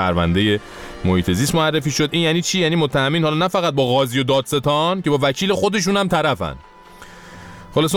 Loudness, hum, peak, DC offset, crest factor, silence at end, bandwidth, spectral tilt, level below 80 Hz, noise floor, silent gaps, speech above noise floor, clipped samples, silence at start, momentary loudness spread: -18 LUFS; none; -6 dBFS; under 0.1%; 12 dB; 0 s; 18 kHz; -5 dB/octave; -42 dBFS; -41 dBFS; none; 23 dB; under 0.1%; 0 s; 8 LU